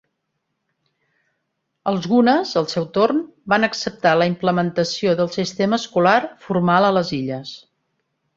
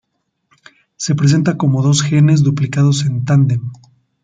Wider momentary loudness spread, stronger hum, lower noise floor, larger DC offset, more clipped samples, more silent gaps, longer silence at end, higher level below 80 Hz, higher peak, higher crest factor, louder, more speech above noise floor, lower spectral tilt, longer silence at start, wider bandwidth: about the same, 8 LU vs 8 LU; neither; first, -75 dBFS vs -67 dBFS; neither; neither; neither; first, 0.8 s vs 0.5 s; second, -60 dBFS vs -52 dBFS; about the same, -2 dBFS vs -2 dBFS; first, 18 dB vs 12 dB; second, -19 LUFS vs -14 LUFS; about the same, 57 dB vs 54 dB; about the same, -5.5 dB/octave vs -6 dB/octave; first, 1.85 s vs 1 s; second, 7.8 kHz vs 9.2 kHz